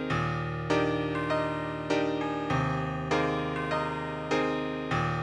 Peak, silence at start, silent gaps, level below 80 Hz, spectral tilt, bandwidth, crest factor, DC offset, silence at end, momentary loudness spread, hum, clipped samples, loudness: -14 dBFS; 0 s; none; -52 dBFS; -6.5 dB/octave; 10.5 kHz; 16 dB; under 0.1%; 0 s; 4 LU; none; under 0.1%; -30 LUFS